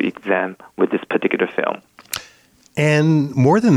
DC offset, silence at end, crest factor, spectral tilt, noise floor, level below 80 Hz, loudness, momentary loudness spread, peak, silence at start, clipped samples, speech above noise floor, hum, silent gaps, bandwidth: under 0.1%; 0 s; 14 dB; -6.5 dB/octave; -52 dBFS; -60 dBFS; -19 LUFS; 14 LU; -4 dBFS; 0 s; under 0.1%; 35 dB; none; none; 15.5 kHz